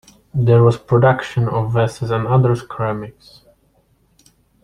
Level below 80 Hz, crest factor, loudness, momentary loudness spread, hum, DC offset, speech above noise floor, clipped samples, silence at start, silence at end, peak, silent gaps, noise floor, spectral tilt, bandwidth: -48 dBFS; 16 dB; -17 LUFS; 10 LU; none; under 0.1%; 43 dB; under 0.1%; 0.35 s; 1.55 s; -2 dBFS; none; -58 dBFS; -8 dB/octave; 10.5 kHz